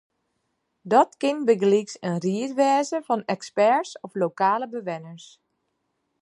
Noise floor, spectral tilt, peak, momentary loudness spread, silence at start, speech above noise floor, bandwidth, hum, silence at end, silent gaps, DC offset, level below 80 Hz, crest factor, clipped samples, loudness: -75 dBFS; -5.5 dB/octave; -4 dBFS; 11 LU; 0.85 s; 52 dB; 11.5 kHz; none; 1 s; none; under 0.1%; -78 dBFS; 20 dB; under 0.1%; -23 LUFS